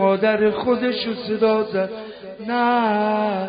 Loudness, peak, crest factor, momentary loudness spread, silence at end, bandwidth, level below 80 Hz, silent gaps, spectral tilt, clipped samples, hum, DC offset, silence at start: -20 LUFS; -6 dBFS; 14 dB; 10 LU; 0 s; 5.2 kHz; -60 dBFS; none; -10.5 dB/octave; under 0.1%; none; under 0.1%; 0 s